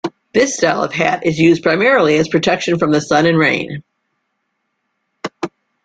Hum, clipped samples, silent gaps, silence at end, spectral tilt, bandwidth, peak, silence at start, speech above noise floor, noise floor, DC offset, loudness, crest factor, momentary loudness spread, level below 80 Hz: none; under 0.1%; none; 0.35 s; -5 dB/octave; 9.2 kHz; 0 dBFS; 0.05 s; 57 dB; -70 dBFS; under 0.1%; -14 LUFS; 14 dB; 16 LU; -54 dBFS